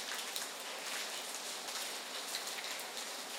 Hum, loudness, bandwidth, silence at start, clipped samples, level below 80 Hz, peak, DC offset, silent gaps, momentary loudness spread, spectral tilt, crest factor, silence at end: none; -40 LUFS; 18 kHz; 0 s; under 0.1%; under -90 dBFS; -20 dBFS; under 0.1%; none; 2 LU; 1.5 dB/octave; 24 dB; 0 s